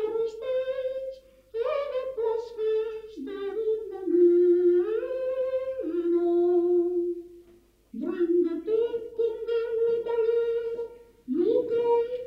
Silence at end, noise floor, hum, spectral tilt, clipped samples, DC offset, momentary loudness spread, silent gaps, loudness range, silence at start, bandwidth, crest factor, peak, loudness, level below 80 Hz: 0 s; -58 dBFS; none; -7 dB/octave; under 0.1%; under 0.1%; 13 LU; none; 6 LU; 0 s; 5.4 kHz; 14 dB; -12 dBFS; -27 LUFS; -64 dBFS